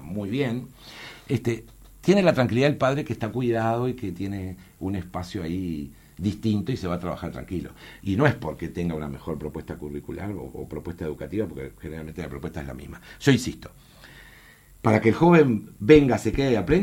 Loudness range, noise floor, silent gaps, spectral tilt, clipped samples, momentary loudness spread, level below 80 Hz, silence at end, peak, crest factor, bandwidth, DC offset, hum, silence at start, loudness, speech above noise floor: 11 LU; -51 dBFS; none; -7 dB/octave; under 0.1%; 17 LU; -46 dBFS; 0 s; -2 dBFS; 22 dB; 17 kHz; under 0.1%; none; 0 s; -25 LUFS; 27 dB